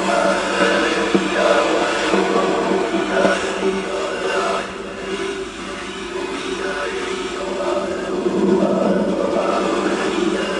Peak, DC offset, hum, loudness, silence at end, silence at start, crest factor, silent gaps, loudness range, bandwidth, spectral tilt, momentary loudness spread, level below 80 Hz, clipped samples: -2 dBFS; under 0.1%; none; -19 LUFS; 0 s; 0 s; 18 dB; none; 7 LU; 11.5 kHz; -4.5 dB/octave; 9 LU; -48 dBFS; under 0.1%